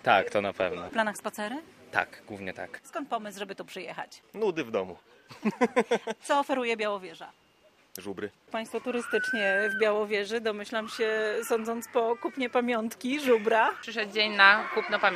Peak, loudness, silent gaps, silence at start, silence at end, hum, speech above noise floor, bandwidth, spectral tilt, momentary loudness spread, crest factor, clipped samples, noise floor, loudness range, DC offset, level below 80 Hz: -2 dBFS; -28 LUFS; none; 0.05 s; 0 s; none; 34 dB; 14.5 kHz; -3.5 dB/octave; 15 LU; 26 dB; under 0.1%; -62 dBFS; 9 LU; under 0.1%; -74 dBFS